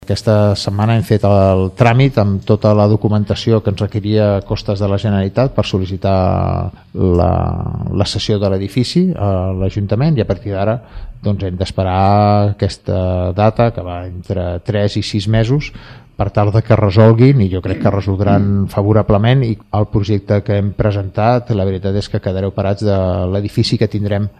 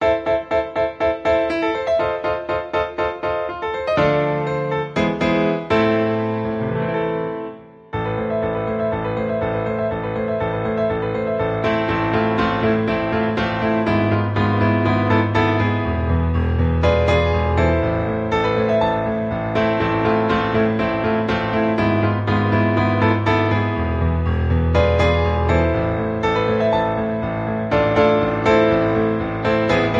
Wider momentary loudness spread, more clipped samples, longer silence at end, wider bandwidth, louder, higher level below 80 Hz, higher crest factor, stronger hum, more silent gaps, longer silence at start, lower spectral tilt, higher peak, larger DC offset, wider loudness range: about the same, 8 LU vs 6 LU; neither; about the same, 0.1 s vs 0 s; first, 10 kHz vs 7.6 kHz; first, -15 LUFS vs -19 LUFS; about the same, -34 dBFS vs -30 dBFS; about the same, 14 dB vs 16 dB; neither; neither; about the same, 0.1 s vs 0 s; about the same, -7.5 dB/octave vs -8 dB/octave; about the same, 0 dBFS vs -2 dBFS; neither; about the same, 4 LU vs 4 LU